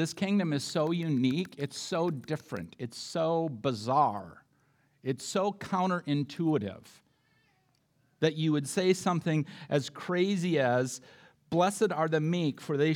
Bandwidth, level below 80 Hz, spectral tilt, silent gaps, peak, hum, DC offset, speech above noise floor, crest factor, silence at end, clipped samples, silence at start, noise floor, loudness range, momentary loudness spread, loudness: 16.5 kHz; -76 dBFS; -5.5 dB/octave; none; -12 dBFS; none; under 0.1%; 41 dB; 18 dB; 0 s; under 0.1%; 0 s; -71 dBFS; 4 LU; 9 LU; -30 LUFS